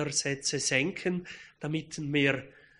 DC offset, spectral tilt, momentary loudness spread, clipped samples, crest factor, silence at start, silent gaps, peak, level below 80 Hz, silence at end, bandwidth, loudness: under 0.1%; -3.5 dB/octave; 10 LU; under 0.1%; 20 dB; 0 s; none; -10 dBFS; -64 dBFS; 0.3 s; 10.5 kHz; -30 LUFS